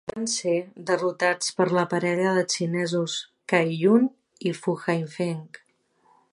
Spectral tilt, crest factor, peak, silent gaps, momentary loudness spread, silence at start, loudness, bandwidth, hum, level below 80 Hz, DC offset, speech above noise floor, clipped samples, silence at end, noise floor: -4.5 dB/octave; 20 dB; -6 dBFS; none; 9 LU; 0.05 s; -25 LUFS; 11.5 kHz; none; -70 dBFS; under 0.1%; 40 dB; under 0.1%; 0.85 s; -64 dBFS